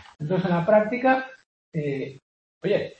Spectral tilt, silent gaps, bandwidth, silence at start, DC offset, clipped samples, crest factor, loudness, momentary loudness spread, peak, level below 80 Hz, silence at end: -8.5 dB/octave; 1.46-1.72 s, 2.22-2.61 s; 8 kHz; 0.2 s; under 0.1%; under 0.1%; 18 dB; -24 LUFS; 14 LU; -6 dBFS; -64 dBFS; 0.1 s